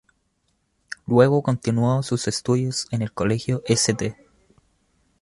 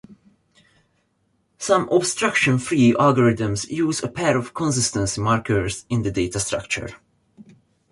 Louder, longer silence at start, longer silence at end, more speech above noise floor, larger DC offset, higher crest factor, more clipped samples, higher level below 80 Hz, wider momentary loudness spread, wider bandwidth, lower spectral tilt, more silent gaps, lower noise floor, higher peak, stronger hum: about the same, -22 LUFS vs -21 LUFS; first, 1.1 s vs 0.1 s; first, 1.1 s vs 0.5 s; about the same, 49 dB vs 47 dB; neither; about the same, 20 dB vs 18 dB; neither; second, -54 dBFS vs -48 dBFS; about the same, 10 LU vs 8 LU; about the same, 11.5 kHz vs 11.5 kHz; about the same, -5.5 dB/octave vs -4.5 dB/octave; neither; about the same, -70 dBFS vs -67 dBFS; about the same, -4 dBFS vs -4 dBFS; neither